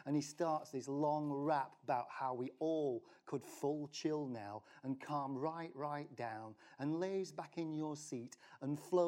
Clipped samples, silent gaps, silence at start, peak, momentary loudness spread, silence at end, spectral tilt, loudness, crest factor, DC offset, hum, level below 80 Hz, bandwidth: under 0.1%; none; 0 s; -24 dBFS; 10 LU; 0 s; -6 dB/octave; -42 LUFS; 18 dB; under 0.1%; none; under -90 dBFS; 16 kHz